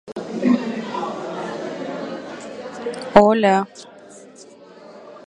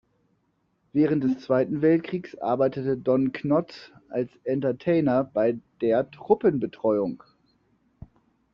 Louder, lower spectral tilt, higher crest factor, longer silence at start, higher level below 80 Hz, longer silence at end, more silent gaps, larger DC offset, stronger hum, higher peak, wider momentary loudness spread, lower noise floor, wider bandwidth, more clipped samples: first, -20 LUFS vs -25 LUFS; second, -6 dB/octave vs -7.5 dB/octave; about the same, 22 dB vs 20 dB; second, 0.05 s vs 0.95 s; first, -52 dBFS vs -62 dBFS; second, 0.05 s vs 1.35 s; neither; neither; neither; first, 0 dBFS vs -6 dBFS; first, 26 LU vs 9 LU; second, -44 dBFS vs -71 dBFS; first, 10.5 kHz vs 6.6 kHz; neither